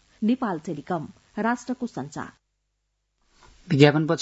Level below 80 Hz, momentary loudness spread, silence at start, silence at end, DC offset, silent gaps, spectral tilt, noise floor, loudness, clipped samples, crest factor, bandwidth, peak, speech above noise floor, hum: -64 dBFS; 18 LU; 0.2 s; 0 s; under 0.1%; none; -6.5 dB/octave; -76 dBFS; -24 LUFS; under 0.1%; 24 dB; 8 kHz; 0 dBFS; 52 dB; 50 Hz at -55 dBFS